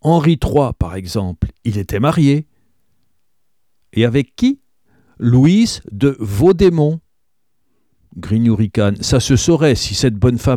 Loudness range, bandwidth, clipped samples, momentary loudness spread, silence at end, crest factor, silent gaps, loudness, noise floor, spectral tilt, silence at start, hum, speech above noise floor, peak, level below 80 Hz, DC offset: 4 LU; 16 kHz; under 0.1%; 10 LU; 0 s; 14 dB; none; -15 LUFS; -74 dBFS; -6.5 dB/octave; 0.05 s; none; 60 dB; -2 dBFS; -34 dBFS; 0.1%